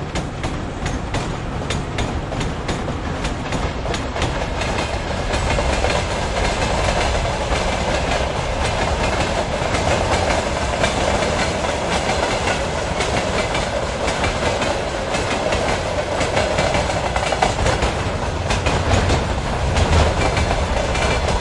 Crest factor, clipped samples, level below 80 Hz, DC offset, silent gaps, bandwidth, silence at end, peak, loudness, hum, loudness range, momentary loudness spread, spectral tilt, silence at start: 18 dB; under 0.1%; -28 dBFS; under 0.1%; none; 11.5 kHz; 0 s; -2 dBFS; -20 LUFS; none; 4 LU; 6 LU; -4.5 dB/octave; 0 s